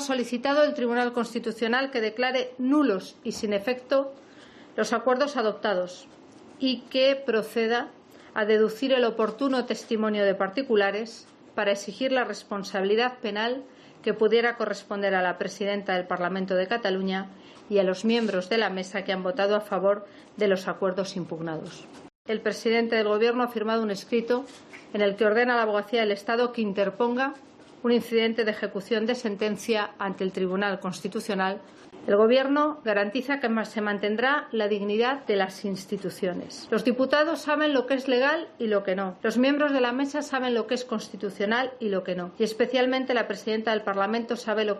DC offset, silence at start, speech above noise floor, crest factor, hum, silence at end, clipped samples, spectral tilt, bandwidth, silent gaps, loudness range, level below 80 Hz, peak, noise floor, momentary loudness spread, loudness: under 0.1%; 0 s; 24 dB; 16 dB; none; 0 s; under 0.1%; -5 dB/octave; 13.5 kHz; 22.15-22.25 s; 3 LU; -74 dBFS; -10 dBFS; -49 dBFS; 9 LU; -26 LUFS